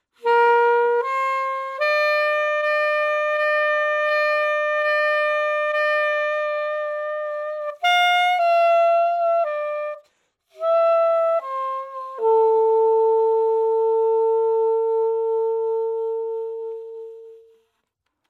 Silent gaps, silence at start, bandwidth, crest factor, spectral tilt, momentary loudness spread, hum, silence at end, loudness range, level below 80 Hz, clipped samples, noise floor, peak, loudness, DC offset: none; 0.25 s; 13 kHz; 14 dB; 0.5 dB/octave; 10 LU; none; 0.9 s; 3 LU; -86 dBFS; under 0.1%; -76 dBFS; -8 dBFS; -20 LUFS; under 0.1%